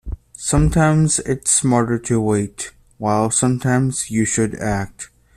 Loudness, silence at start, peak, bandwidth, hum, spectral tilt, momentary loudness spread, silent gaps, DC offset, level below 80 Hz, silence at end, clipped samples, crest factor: -18 LUFS; 0.05 s; -4 dBFS; 14.5 kHz; none; -5 dB/octave; 12 LU; none; under 0.1%; -34 dBFS; 0.3 s; under 0.1%; 16 dB